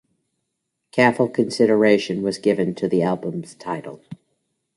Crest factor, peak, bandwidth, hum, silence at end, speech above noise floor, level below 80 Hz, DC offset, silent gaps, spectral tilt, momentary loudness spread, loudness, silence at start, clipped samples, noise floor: 20 dB; -2 dBFS; 11.5 kHz; none; 0.6 s; 58 dB; -64 dBFS; under 0.1%; none; -6 dB/octave; 14 LU; -20 LUFS; 0.95 s; under 0.1%; -77 dBFS